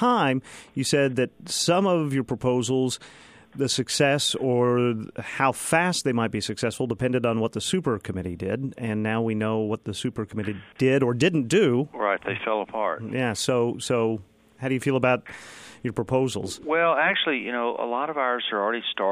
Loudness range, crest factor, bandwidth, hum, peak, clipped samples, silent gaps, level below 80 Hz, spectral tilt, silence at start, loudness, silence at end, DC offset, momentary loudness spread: 3 LU; 18 dB; 15.5 kHz; none; -6 dBFS; under 0.1%; none; -60 dBFS; -4.5 dB/octave; 0 s; -25 LUFS; 0 s; under 0.1%; 10 LU